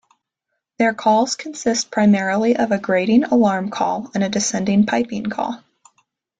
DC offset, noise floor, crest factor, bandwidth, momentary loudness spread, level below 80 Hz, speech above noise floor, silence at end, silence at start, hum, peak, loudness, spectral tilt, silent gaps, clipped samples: under 0.1%; -78 dBFS; 16 dB; 9.2 kHz; 8 LU; -60 dBFS; 60 dB; 0.85 s; 0.8 s; none; -4 dBFS; -18 LUFS; -4.5 dB/octave; none; under 0.1%